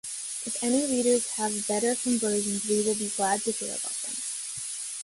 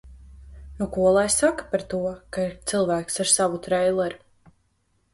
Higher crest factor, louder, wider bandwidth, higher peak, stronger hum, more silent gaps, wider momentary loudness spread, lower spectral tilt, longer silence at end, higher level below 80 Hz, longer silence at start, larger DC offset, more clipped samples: about the same, 16 dB vs 20 dB; second, -27 LUFS vs -23 LUFS; about the same, 12 kHz vs 11.5 kHz; second, -12 dBFS vs -6 dBFS; neither; neither; about the same, 8 LU vs 10 LU; about the same, -2.5 dB/octave vs -3.5 dB/octave; second, 0 s vs 0.95 s; second, -68 dBFS vs -48 dBFS; about the same, 0.05 s vs 0.05 s; neither; neither